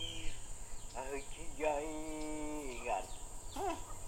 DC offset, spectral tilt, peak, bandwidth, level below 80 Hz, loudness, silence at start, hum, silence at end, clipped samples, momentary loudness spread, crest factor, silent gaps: under 0.1%; -3.5 dB/octave; -22 dBFS; 16 kHz; -48 dBFS; -43 LUFS; 0 s; none; 0 s; under 0.1%; 11 LU; 18 dB; none